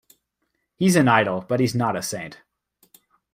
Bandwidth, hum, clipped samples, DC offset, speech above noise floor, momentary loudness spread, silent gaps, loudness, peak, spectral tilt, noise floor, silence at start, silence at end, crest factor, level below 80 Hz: 16 kHz; none; under 0.1%; under 0.1%; 55 dB; 14 LU; none; -21 LUFS; -2 dBFS; -5.5 dB/octave; -75 dBFS; 0.8 s; 1 s; 20 dB; -62 dBFS